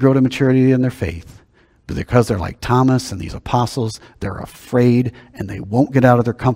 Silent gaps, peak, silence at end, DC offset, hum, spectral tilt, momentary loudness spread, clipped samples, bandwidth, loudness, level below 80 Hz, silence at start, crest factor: none; 0 dBFS; 0 s; under 0.1%; none; -7.5 dB/octave; 15 LU; under 0.1%; 15.5 kHz; -17 LUFS; -40 dBFS; 0 s; 16 dB